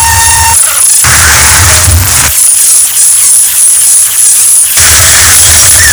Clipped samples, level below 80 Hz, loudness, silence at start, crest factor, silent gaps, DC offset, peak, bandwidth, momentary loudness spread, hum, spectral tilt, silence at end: 10%; -20 dBFS; -1 LUFS; 0 s; 4 dB; none; under 0.1%; 0 dBFS; over 20 kHz; 3 LU; none; 0 dB/octave; 0 s